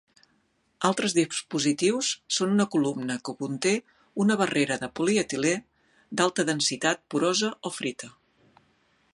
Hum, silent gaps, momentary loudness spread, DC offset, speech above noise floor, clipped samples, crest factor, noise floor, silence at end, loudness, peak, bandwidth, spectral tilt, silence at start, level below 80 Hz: none; none; 8 LU; under 0.1%; 43 dB; under 0.1%; 22 dB; -69 dBFS; 1.05 s; -26 LUFS; -6 dBFS; 11.5 kHz; -3.5 dB/octave; 0.8 s; -68 dBFS